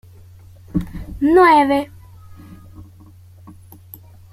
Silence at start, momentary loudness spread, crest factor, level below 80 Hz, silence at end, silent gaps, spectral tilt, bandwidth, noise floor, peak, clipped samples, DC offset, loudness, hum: 0.75 s; 19 LU; 18 dB; -42 dBFS; 1.5 s; none; -7 dB/octave; 15 kHz; -44 dBFS; -2 dBFS; under 0.1%; under 0.1%; -15 LUFS; none